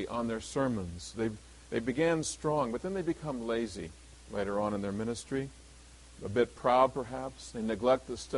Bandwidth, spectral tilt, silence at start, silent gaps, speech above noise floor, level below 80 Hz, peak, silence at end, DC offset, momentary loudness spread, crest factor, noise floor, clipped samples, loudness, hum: 11.5 kHz; -5.5 dB/octave; 0 s; none; 22 dB; -54 dBFS; -12 dBFS; 0 s; under 0.1%; 12 LU; 22 dB; -54 dBFS; under 0.1%; -33 LUFS; none